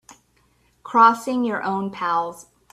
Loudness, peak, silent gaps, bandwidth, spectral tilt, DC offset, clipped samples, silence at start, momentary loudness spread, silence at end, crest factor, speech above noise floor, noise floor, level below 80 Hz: -20 LUFS; -2 dBFS; none; 13.5 kHz; -5 dB/octave; under 0.1%; under 0.1%; 0.85 s; 10 LU; 0.3 s; 22 dB; 42 dB; -62 dBFS; -66 dBFS